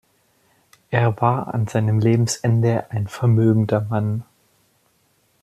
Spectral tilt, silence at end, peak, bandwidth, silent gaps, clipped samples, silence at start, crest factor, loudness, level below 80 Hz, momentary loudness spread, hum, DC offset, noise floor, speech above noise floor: -7 dB/octave; 1.2 s; -4 dBFS; 12 kHz; none; under 0.1%; 0.9 s; 18 dB; -20 LUFS; -58 dBFS; 7 LU; none; under 0.1%; -63 dBFS; 45 dB